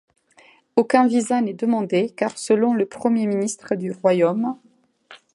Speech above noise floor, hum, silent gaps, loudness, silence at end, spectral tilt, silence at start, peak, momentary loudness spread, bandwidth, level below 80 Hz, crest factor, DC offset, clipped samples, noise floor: 34 dB; none; none; -21 LUFS; 0.2 s; -5.5 dB/octave; 0.75 s; -2 dBFS; 9 LU; 11.5 kHz; -72 dBFS; 20 dB; under 0.1%; under 0.1%; -54 dBFS